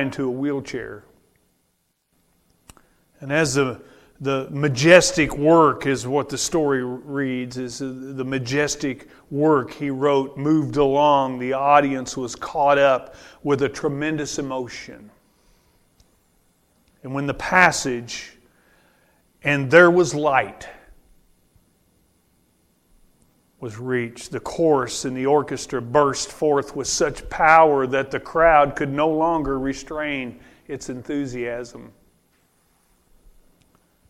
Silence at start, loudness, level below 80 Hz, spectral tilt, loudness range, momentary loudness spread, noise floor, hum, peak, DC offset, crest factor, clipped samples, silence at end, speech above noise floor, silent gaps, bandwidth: 0 s; -20 LUFS; -48 dBFS; -4.5 dB/octave; 12 LU; 17 LU; -69 dBFS; none; 0 dBFS; under 0.1%; 22 dB; under 0.1%; 2.2 s; 49 dB; none; 15 kHz